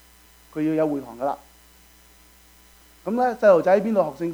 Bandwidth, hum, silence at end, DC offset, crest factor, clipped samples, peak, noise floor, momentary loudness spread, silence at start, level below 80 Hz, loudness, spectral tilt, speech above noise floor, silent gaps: over 20 kHz; none; 0 s; under 0.1%; 20 dB; under 0.1%; -4 dBFS; -53 dBFS; 16 LU; 0.55 s; -58 dBFS; -21 LUFS; -7 dB/octave; 32 dB; none